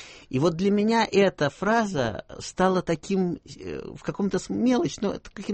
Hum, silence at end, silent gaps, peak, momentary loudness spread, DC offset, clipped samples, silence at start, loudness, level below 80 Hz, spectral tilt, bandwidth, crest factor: none; 0 s; none; -8 dBFS; 14 LU; under 0.1%; under 0.1%; 0 s; -25 LUFS; -52 dBFS; -6 dB/octave; 8.8 kHz; 18 dB